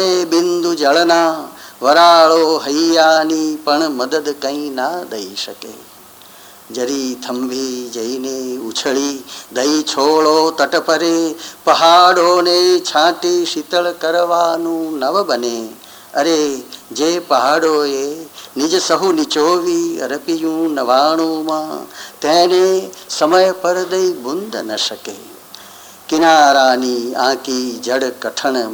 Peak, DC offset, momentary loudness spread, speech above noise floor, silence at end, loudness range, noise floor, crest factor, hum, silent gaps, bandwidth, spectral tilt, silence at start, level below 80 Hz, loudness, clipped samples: 0 dBFS; under 0.1%; 14 LU; 25 dB; 0 s; 9 LU; -40 dBFS; 14 dB; none; none; over 20 kHz; -2.5 dB/octave; 0 s; -68 dBFS; -14 LUFS; under 0.1%